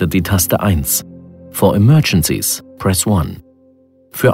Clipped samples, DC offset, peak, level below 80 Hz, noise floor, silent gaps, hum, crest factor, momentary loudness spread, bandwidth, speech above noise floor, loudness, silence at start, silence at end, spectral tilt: under 0.1%; under 0.1%; 0 dBFS; -34 dBFS; -50 dBFS; none; none; 14 dB; 8 LU; 16.5 kHz; 36 dB; -14 LUFS; 0 s; 0 s; -5 dB/octave